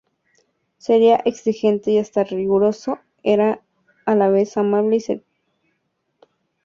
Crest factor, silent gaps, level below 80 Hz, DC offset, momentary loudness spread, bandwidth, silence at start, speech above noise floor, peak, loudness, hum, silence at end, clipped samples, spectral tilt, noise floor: 16 dB; none; -64 dBFS; under 0.1%; 12 LU; 7.4 kHz; 0.9 s; 54 dB; -4 dBFS; -19 LUFS; none; 1.45 s; under 0.1%; -6.5 dB/octave; -71 dBFS